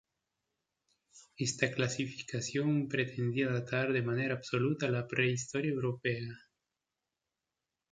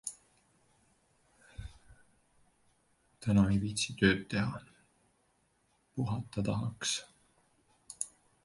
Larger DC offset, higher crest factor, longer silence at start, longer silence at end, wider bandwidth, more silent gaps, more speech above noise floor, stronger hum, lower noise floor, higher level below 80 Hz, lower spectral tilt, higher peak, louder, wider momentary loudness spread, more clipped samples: neither; about the same, 22 dB vs 24 dB; first, 1.15 s vs 0.05 s; first, 1.55 s vs 0.35 s; second, 9.6 kHz vs 11.5 kHz; neither; first, 56 dB vs 42 dB; neither; first, -89 dBFS vs -74 dBFS; second, -72 dBFS vs -56 dBFS; about the same, -5 dB/octave vs -4.5 dB/octave; about the same, -14 dBFS vs -12 dBFS; about the same, -34 LUFS vs -33 LUFS; second, 5 LU vs 22 LU; neither